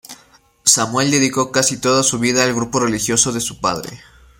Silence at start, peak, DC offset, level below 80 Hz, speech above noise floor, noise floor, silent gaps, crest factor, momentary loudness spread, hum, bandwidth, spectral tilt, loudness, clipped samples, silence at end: 0.1 s; 0 dBFS; under 0.1%; -50 dBFS; 34 dB; -51 dBFS; none; 18 dB; 7 LU; none; 16.5 kHz; -2.5 dB/octave; -16 LUFS; under 0.1%; 0.4 s